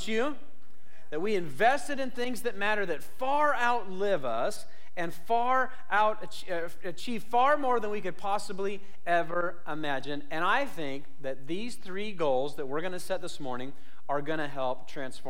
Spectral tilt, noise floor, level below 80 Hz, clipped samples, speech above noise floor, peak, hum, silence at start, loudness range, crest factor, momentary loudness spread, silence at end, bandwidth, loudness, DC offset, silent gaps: -4.5 dB/octave; -61 dBFS; -66 dBFS; under 0.1%; 30 dB; -14 dBFS; none; 0 s; 5 LU; 16 dB; 13 LU; 0 s; 16.5 kHz; -31 LUFS; 4%; none